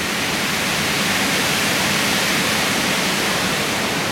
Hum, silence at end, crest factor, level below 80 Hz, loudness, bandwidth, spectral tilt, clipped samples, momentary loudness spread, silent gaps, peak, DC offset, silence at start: none; 0 s; 12 dB; -48 dBFS; -17 LUFS; 16.5 kHz; -2 dB/octave; under 0.1%; 2 LU; none; -6 dBFS; under 0.1%; 0 s